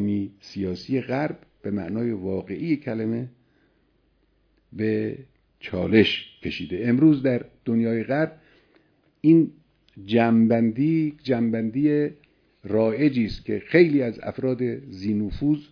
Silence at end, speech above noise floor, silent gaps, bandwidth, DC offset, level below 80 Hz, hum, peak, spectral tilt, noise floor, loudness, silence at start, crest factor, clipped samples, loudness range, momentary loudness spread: 0.1 s; 43 dB; none; 5.4 kHz; under 0.1%; -52 dBFS; none; -4 dBFS; -8.5 dB/octave; -65 dBFS; -23 LUFS; 0 s; 20 dB; under 0.1%; 8 LU; 13 LU